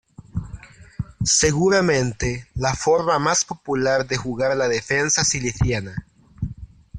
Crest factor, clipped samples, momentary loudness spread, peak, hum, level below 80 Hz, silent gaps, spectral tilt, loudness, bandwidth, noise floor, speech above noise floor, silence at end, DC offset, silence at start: 18 dB; under 0.1%; 16 LU; -4 dBFS; none; -40 dBFS; none; -3.5 dB/octave; -20 LUFS; 11 kHz; -40 dBFS; 20 dB; 0 s; under 0.1%; 0.35 s